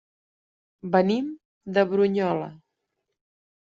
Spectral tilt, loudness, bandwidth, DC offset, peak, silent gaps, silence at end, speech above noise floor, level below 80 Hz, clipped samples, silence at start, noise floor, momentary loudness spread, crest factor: -5.5 dB/octave; -24 LUFS; 7.4 kHz; under 0.1%; -8 dBFS; 1.45-1.61 s; 1.1 s; 57 dB; -70 dBFS; under 0.1%; 0.85 s; -80 dBFS; 18 LU; 20 dB